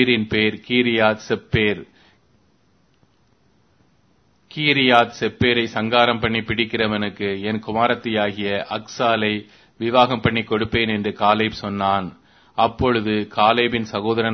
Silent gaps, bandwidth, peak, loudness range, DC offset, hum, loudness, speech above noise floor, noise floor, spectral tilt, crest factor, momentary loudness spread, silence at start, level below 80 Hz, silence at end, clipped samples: none; 6.6 kHz; 0 dBFS; 5 LU; under 0.1%; none; -19 LUFS; 41 dB; -61 dBFS; -6 dB/octave; 20 dB; 8 LU; 0 s; -48 dBFS; 0 s; under 0.1%